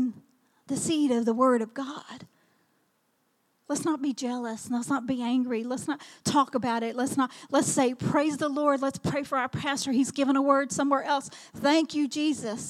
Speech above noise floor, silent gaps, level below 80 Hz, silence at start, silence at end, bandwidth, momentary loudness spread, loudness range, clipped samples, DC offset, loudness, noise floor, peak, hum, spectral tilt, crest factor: 45 dB; none; -70 dBFS; 0 s; 0 s; 14 kHz; 9 LU; 5 LU; under 0.1%; under 0.1%; -27 LUFS; -72 dBFS; -8 dBFS; none; -4.5 dB/octave; 20 dB